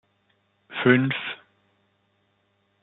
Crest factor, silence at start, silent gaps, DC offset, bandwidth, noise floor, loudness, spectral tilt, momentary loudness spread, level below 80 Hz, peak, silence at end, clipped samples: 24 dB; 0.7 s; none; under 0.1%; 4.1 kHz; -69 dBFS; -23 LUFS; -4.5 dB/octave; 17 LU; -72 dBFS; -4 dBFS; 1.5 s; under 0.1%